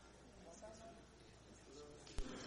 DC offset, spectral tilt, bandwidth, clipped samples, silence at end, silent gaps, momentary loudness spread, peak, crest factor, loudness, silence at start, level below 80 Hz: under 0.1%; -4 dB/octave; 11 kHz; under 0.1%; 0 s; none; 10 LU; -28 dBFS; 26 dB; -58 LUFS; 0 s; -58 dBFS